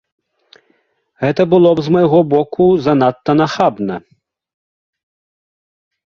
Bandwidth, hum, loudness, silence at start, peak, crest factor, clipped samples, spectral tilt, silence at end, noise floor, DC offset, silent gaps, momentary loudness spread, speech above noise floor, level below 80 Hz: 7 kHz; none; -13 LUFS; 1.2 s; 0 dBFS; 16 dB; under 0.1%; -8 dB/octave; 2.15 s; -61 dBFS; under 0.1%; none; 9 LU; 48 dB; -52 dBFS